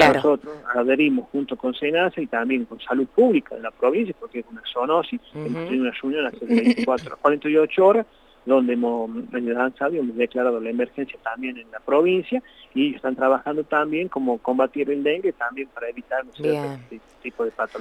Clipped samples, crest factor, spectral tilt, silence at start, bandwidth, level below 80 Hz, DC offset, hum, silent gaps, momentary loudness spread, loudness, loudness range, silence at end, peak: under 0.1%; 18 dB; -6 dB/octave; 0 s; 11.5 kHz; -60 dBFS; under 0.1%; none; none; 12 LU; -22 LUFS; 4 LU; 0 s; -4 dBFS